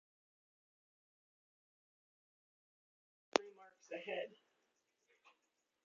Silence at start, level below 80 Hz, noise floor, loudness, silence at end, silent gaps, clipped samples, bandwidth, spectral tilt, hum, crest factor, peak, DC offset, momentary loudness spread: 3.35 s; under -90 dBFS; -85 dBFS; -43 LUFS; 1.5 s; none; under 0.1%; 7.4 kHz; -0.5 dB/octave; none; 42 dB; -8 dBFS; under 0.1%; 12 LU